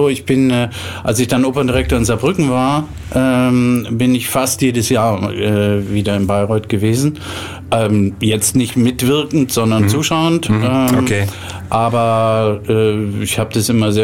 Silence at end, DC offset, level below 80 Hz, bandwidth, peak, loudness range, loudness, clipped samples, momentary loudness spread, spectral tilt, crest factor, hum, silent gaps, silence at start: 0 s; 0.3%; -36 dBFS; 17 kHz; -2 dBFS; 2 LU; -15 LUFS; under 0.1%; 5 LU; -5.5 dB/octave; 12 dB; none; none; 0 s